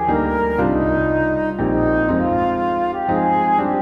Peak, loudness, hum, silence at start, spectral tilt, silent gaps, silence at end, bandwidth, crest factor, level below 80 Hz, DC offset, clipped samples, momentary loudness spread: -6 dBFS; -18 LUFS; none; 0 s; -9.5 dB/octave; none; 0 s; 5.6 kHz; 12 dB; -34 dBFS; under 0.1%; under 0.1%; 3 LU